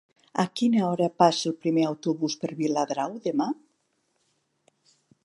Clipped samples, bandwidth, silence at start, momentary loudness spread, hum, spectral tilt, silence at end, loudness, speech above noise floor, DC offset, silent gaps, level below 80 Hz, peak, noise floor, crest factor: under 0.1%; 11.5 kHz; 0.35 s; 8 LU; none; -5.5 dB/octave; 1.7 s; -26 LUFS; 48 dB; under 0.1%; none; -78 dBFS; -6 dBFS; -73 dBFS; 22 dB